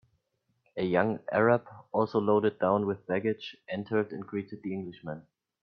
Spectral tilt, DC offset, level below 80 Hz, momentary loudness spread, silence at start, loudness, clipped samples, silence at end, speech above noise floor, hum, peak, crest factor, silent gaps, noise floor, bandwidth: -9 dB/octave; under 0.1%; -70 dBFS; 13 LU; 0.75 s; -30 LUFS; under 0.1%; 0.4 s; 48 dB; none; -10 dBFS; 22 dB; none; -77 dBFS; 6.2 kHz